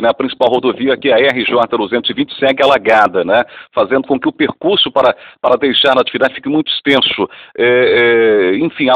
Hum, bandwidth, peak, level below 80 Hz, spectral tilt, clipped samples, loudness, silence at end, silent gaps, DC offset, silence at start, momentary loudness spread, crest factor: none; 9.4 kHz; 0 dBFS; -52 dBFS; -5.5 dB/octave; 0.2%; -12 LUFS; 0 s; none; under 0.1%; 0 s; 6 LU; 12 dB